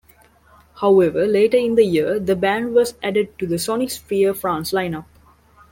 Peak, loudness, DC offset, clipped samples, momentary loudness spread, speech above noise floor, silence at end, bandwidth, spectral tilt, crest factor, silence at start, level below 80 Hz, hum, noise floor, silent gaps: -4 dBFS; -19 LUFS; under 0.1%; under 0.1%; 8 LU; 34 dB; 0.7 s; 17 kHz; -5 dB/octave; 16 dB; 0.75 s; -52 dBFS; none; -52 dBFS; none